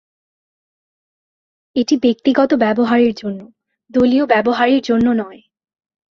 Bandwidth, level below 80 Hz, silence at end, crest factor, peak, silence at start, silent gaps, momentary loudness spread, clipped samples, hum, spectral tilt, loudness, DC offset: 7 kHz; -54 dBFS; 0.75 s; 16 dB; -2 dBFS; 1.75 s; none; 11 LU; under 0.1%; none; -5.5 dB/octave; -15 LUFS; under 0.1%